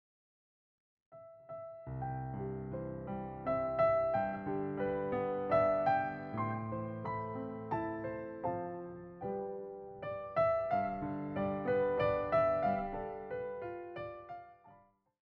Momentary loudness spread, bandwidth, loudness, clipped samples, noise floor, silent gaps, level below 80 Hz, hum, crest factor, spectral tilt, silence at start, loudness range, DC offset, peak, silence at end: 15 LU; 5.6 kHz; -36 LUFS; under 0.1%; -65 dBFS; none; -60 dBFS; none; 18 dB; -9.5 dB/octave; 1.1 s; 7 LU; under 0.1%; -20 dBFS; 0.55 s